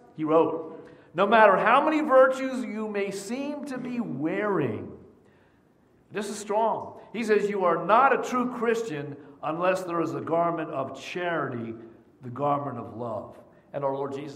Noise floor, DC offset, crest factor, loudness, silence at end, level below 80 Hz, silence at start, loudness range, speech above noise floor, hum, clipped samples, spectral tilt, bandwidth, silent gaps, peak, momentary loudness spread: -61 dBFS; under 0.1%; 22 dB; -26 LUFS; 0 s; -72 dBFS; 0.15 s; 9 LU; 36 dB; none; under 0.1%; -5.5 dB/octave; 14.5 kHz; none; -4 dBFS; 18 LU